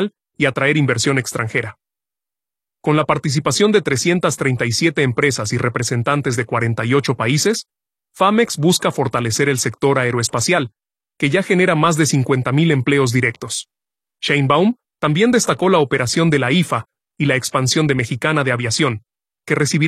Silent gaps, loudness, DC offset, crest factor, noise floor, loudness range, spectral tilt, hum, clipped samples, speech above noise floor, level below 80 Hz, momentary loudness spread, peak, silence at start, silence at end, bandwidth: none; -17 LUFS; under 0.1%; 16 dB; -89 dBFS; 2 LU; -4.5 dB/octave; none; under 0.1%; 73 dB; -54 dBFS; 6 LU; 0 dBFS; 0 s; 0 s; 14.5 kHz